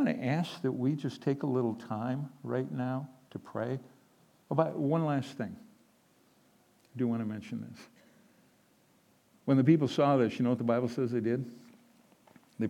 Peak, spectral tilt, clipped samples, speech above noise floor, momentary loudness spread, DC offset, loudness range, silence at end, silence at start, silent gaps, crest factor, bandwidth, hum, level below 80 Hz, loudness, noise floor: -12 dBFS; -8 dB/octave; under 0.1%; 36 dB; 15 LU; under 0.1%; 11 LU; 0 s; 0 s; none; 22 dB; 13.5 kHz; none; -84 dBFS; -32 LUFS; -67 dBFS